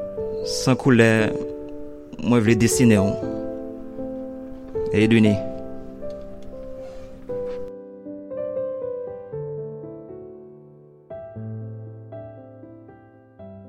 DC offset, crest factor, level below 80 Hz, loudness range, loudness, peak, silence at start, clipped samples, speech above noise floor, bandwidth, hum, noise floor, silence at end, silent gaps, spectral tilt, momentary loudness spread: under 0.1%; 22 dB; -48 dBFS; 18 LU; -22 LUFS; -2 dBFS; 0 s; under 0.1%; 31 dB; 16 kHz; none; -48 dBFS; 0 s; none; -6 dB/octave; 22 LU